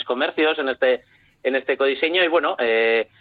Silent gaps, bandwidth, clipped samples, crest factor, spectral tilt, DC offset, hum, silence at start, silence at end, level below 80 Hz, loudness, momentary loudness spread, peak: none; 4.8 kHz; under 0.1%; 14 dB; -6 dB/octave; under 0.1%; none; 0 s; 0.15 s; -66 dBFS; -20 LUFS; 6 LU; -6 dBFS